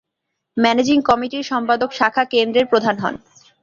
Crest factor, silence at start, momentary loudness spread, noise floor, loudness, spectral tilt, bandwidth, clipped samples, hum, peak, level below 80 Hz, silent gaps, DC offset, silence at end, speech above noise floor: 16 dB; 0.55 s; 8 LU; -78 dBFS; -17 LUFS; -4.5 dB/octave; 7.4 kHz; under 0.1%; none; -2 dBFS; -56 dBFS; none; under 0.1%; 0.45 s; 61 dB